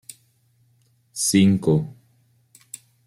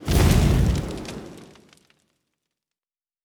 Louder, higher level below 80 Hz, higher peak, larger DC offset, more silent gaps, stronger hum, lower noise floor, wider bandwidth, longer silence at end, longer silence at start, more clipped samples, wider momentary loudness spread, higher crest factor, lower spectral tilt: about the same, -19 LUFS vs -21 LUFS; second, -58 dBFS vs -28 dBFS; about the same, -6 dBFS vs -6 dBFS; neither; neither; neither; second, -62 dBFS vs under -90 dBFS; second, 16 kHz vs over 20 kHz; second, 1.15 s vs 1.8 s; first, 1.15 s vs 0 s; neither; first, 23 LU vs 20 LU; about the same, 18 dB vs 18 dB; about the same, -5 dB/octave vs -6 dB/octave